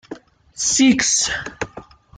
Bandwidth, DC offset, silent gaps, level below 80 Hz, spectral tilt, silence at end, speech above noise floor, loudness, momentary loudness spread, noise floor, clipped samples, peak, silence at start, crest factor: 10 kHz; under 0.1%; none; -48 dBFS; -1.5 dB/octave; 0.35 s; 24 dB; -16 LUFS; 16 LU; -41 dBFS; under 0.1%; -4 dBFS; 0.1 s; 16 dB